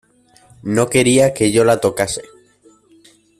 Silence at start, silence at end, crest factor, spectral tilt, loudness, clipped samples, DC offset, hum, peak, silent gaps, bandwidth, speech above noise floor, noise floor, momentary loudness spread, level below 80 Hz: 0.65 s; 1.15 s; 16 dB; -4.5 dB/octave; -15 LUFS; under 0.1%; under 0.1%; none; -2 dBFS; none; 14.5 kHz; 37 dB; -51 dBFS; 10 LU; -50 dBFS